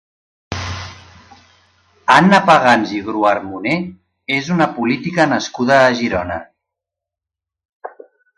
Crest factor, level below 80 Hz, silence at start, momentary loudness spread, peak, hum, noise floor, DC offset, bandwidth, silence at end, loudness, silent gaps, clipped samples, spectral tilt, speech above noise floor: 18 dB; -44 dBFS; 0.5 s; 21 LU; 0 dBFS; none; -86 dBFS; under 0.1%; 11.5 kHz; 0.5 s; -15 LUFS; 7.73-7.80 s; under 0.1%; -5.5 dB/octave; 71 dB